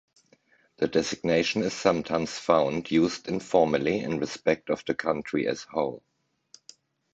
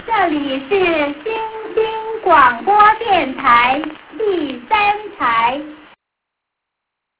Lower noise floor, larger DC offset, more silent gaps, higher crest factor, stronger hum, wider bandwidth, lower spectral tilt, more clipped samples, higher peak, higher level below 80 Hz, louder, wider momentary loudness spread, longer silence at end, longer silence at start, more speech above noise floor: second, -63 dBFS vs -79 dBFS; neither; neither; first, 22 dB vs 16 dB; neither; first, 8.2 kHz vs 4 kHz; second, -5 dB/octave vs -7.5 dB/octave; neither; second, -6 dBFS vs 0 dBFS; second, -60 dBFS vs -50 dBFS; second, -27 LUFS vs -15 LUFS; second, 7 LU vs 11 LU; second, 1.15 s vs 1.45 s; first, 0.8 s vs 0 s; second, 37 dB vs 64 dB